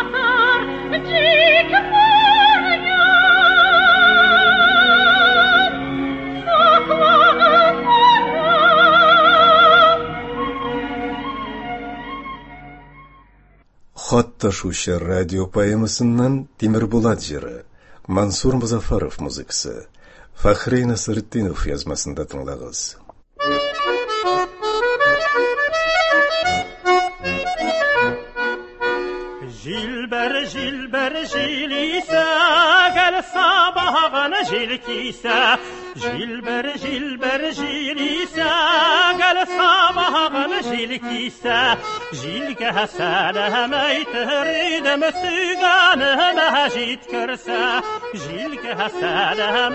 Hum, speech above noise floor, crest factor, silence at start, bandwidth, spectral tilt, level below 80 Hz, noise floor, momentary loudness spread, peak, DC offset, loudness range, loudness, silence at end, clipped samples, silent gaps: none; 32 dB; 16 dB; 0 s; 8.6 kHz; -3.5 dB/octave; -40 dBFS; -52 dBFS; 15 LU; 0 dBFS; under 0.1%; 11 LU; -16 LUFS; 0 s; under 0.1%; none